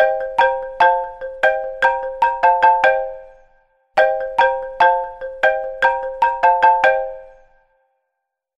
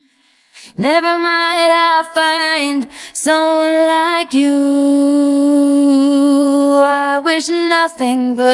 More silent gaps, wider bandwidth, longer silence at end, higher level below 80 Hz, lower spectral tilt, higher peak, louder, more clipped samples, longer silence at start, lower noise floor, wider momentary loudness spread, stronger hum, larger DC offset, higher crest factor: neither; second, 8.2 kHz vs 12 kHz; first, 1.3 s vs 0 s; first, -48 dBFS vs -66 dBFS; about the same, -2.5 dB/octave vs -3 dB/octave; about the same, -2 dBFS vs 0 dBFS; second, -16 LUFS vs -13 LUFS; neither; second, 0 s vs 0.55 s; first, -78 dBFS vs -55 dBFS; first, 10 LU vs 4 LU; neither; neither; about the same, 14 dB vs 12 dB